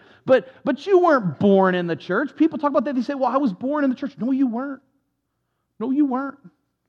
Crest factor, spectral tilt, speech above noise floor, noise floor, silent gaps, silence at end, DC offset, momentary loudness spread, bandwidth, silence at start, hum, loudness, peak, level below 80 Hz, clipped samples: 16 dB; -8 dB/octave; 54 dB; -75 dBFS; none; 0.4 s; under 0.1%; 10 LU; 7 kHz; 0.25 s; none; -21 LUFS; -4 dBFS; -74 dBFS; under 0.1%